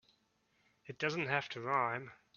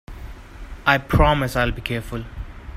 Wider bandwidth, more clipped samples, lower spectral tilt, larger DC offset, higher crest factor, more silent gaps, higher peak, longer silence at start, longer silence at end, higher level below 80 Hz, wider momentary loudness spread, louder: second, 7 kHz vs 16 kHz; neither; second, -3 dB/octave vs -6 dB/octave; neither; about the same, 22 dB vs 22 dB; neither; second, -16 dBFS vs -2 dBFS; first, 0.85 s vs 0.1 s; first, 0.25 s vs 0 s; second, -80 dBFS vs -30 dBFS; second, 8 LU vs 23 LU; second, -36 LUFS vs -20 LUFS